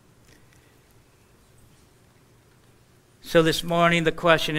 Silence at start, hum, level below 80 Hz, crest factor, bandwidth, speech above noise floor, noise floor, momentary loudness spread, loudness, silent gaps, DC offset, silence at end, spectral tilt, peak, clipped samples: 3.25 s; none; -48 dBFS; 24 dB; 16 kHz; 37 dB; -57 dBFS; 3 LU; -21 LUFS; none; under 0.1%; 0 s; -5 dB/octave; -2 dBFS; under 0.1%